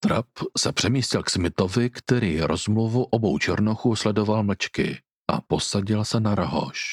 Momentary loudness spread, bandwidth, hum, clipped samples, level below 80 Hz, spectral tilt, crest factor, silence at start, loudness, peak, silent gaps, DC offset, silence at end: 4 LU; 13 kHz; none; under 0.1%; -50 dBFS; -5 dB/octave; 18 dB; 0 s; -24 LUFS; -4 dBFS; 5.16-5.24 s; under 0.1%; 0 s